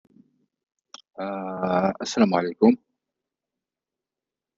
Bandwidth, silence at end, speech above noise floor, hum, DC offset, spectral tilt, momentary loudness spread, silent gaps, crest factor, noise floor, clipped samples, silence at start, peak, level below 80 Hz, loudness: 7.6 kHz; 1.8 s; 67 dB; none; under 0.1%; -6 dB/octave; 13 LU; none; 20 dB; -89 dBFS; under 0.1%; 1.2 s; -6 dBFS; -68 dBFS; -23 LUFS